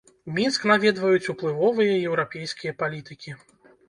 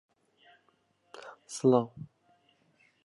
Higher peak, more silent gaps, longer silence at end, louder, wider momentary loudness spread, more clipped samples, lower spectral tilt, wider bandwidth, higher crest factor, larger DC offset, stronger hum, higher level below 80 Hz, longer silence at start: first, -4 dBFS vs -12 dBFS; neither; second, 0.5 s vs 1 s; first, -23 LUFS vs -29 LUFS; second, 19 LU vs 24 LU; neither; second, -5 dB/octave vs -6.5 dB/octave; about the same, 11 kHz vs 11.5 kHz; about the same, 20 dB vs 22 dB; neither; neither; first, -68 dBFS vs -78 dBFS; second, 0.25 s vs 1.25 s